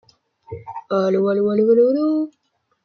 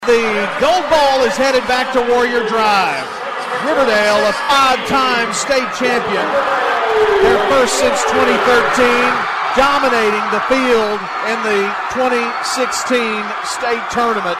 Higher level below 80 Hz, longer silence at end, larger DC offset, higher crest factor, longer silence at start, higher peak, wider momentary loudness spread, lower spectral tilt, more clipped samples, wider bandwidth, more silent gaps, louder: second, -66 dBFS vs -44 dBFS; first, 0.55 s vs 0 s; neither; about the same, 14 dB vs 14 dB; first, 0.5 s vs 0 s; second, -6 dBFS vs 0 dBFS; first, 19 LU vs 6 LU; first, -8.5 dB/octave vs -2.5 dB/octave; neither; second, 6.6 kHz vs 13.5 kHz; neither; second, -18 LUFS vs -14 LUFS